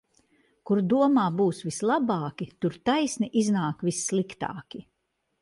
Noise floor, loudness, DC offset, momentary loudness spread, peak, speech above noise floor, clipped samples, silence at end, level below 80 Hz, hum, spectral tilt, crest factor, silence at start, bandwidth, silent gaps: -77 dBFS; -26 LUFS; under 0.1%; 13 LU; -10 dBFS; 52 dB; under 0.1%; 0.6 s; -66 dBFS; none; -5.5 dB/octave; 16 dB; 0.65 s; 11.5 kHz; none